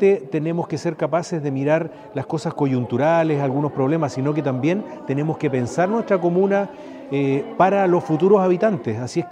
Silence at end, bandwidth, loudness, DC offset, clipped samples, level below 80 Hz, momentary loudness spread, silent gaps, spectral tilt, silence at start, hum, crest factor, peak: 0 s; 10 kHz; -20 LUFS; under 0.1%; under 0.1%; -66 dBFS; 9 LU; none; -7.5 dB/octave; 0 s; none; 16 dB; -2 dBFS